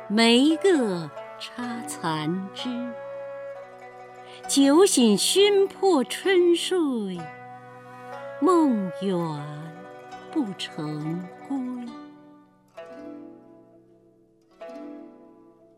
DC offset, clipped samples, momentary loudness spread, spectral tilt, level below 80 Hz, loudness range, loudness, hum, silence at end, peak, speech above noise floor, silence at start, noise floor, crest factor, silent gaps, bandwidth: under 0.1%; under 0.1%; 25 LU; -4 dB/octave; -74 dBFS; 18 LU; -23 LUFS; none; 0.65 s; -8 dBFS; 36 dB; 0 s; -59 dBFS; 18 dB; none; 16 kHz